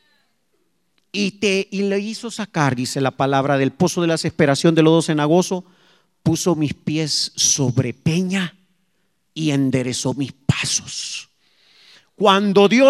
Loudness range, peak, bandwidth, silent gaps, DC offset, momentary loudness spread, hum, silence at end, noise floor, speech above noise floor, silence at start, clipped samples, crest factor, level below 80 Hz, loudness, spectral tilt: 5 LU; 0 dBFS; 14.5 kHz; none; under 0.1%; 11 LU; none; 0 s; -69 dBFS; 52 dB; 1.15 s; under 0.1%; 20 dB; -54 dBFS; -19 LUFS; -4.5 dB/octave